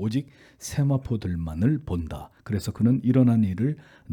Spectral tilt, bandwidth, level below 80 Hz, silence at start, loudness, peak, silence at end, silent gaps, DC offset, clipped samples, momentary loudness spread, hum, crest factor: -8 dB/octave; 18 kHz; -48 dBFS; 0 s; -25 LUFS; -8 dBFS; 0 s; none; under 0.1%; under 0.1%; 17 LU; none; 16 dB